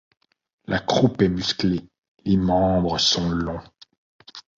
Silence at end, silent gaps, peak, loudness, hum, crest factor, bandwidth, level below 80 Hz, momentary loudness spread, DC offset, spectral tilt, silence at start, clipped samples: 0.2 s; 1.98-2.02 s, 2.08-2.15 s, 3.97-4.19 s; -6 dBFS; -21 LUFS; none; 18 dB; 7.8 kHz; -42 dBFS; 14 LU; under 0.1%; -5 dB/octave; 0.7 s; under 0.1%